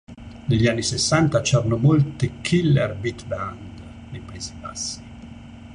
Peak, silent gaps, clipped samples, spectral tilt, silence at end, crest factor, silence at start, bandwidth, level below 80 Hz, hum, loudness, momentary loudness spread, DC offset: -4 dBFS; none; under 0.1%; -5.5 dB/octave; 0 s; 18 dB; 0.1 s; 10.5 kHz; -44 dBFS; none; -21 LUFS; 22 LU; under 0.1%